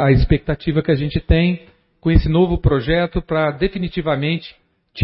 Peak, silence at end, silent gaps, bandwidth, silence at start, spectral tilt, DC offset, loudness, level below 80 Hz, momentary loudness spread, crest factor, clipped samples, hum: 0 dBFS; 0 s; none; 5.8 kHz; 0 s; -12.5 dB/octave; under 0.1%; -18 LUFS; -26 dBFS; 8 LU; 16 dB; under 0.1%; none